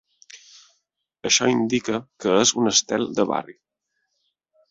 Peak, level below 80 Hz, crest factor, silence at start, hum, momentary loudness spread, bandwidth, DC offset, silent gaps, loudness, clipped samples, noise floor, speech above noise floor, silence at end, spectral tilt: -4 dBFS; -64 dBFS; 20 dB; 0.35 s; none; 10 LU; 8 kHz; under 0.1%; none; -21 LUFS; under 0.1%; -76 dBFS; 55 dB; 1.2 s; -2.5 dB/octave